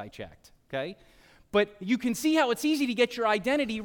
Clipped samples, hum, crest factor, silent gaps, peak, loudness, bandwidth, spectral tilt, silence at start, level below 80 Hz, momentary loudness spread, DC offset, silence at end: under 0.1%; none; 16 dB; none; -12 dBFS; -27 LUFS; 17.5 kHz; -4 dB/octave; 0 s; -60 dBFS; 14 LU; under 0.1%; 0 s